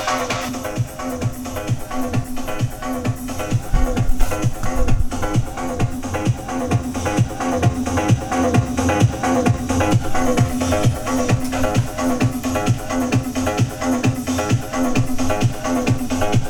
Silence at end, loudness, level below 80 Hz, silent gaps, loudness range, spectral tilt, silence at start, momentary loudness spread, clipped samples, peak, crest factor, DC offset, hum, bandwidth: 0 s; -20 LUFS; -28 dBFS; none; 5 LU; -6 dB/octave; 0 s; 7 LU; under 0.1%; -2 dBFS; 16 dB; under 0.1%; none; 19.5 kHz